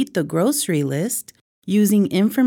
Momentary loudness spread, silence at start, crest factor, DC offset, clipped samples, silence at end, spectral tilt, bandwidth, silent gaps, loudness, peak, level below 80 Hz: 8 LU; 0 s; 12 dB; under 0.1%; under 0.1%; 0 s; -5.5 dB/octave; 19 kHz; 1.41-1.62 s; -19 LUFS; -8 dBFS; -68 dBFS